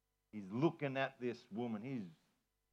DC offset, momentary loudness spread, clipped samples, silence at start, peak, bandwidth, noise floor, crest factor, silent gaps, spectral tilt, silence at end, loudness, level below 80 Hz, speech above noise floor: under 0.1%; 15 LU; under 0.1%; 0.35 s; -22 dBFS; 7.6 kHz; -82 dBFS; 20 dB; none; -7.5 dB/octave; 0.6 s; -42 LUFS; -90 dBFS; 41 dB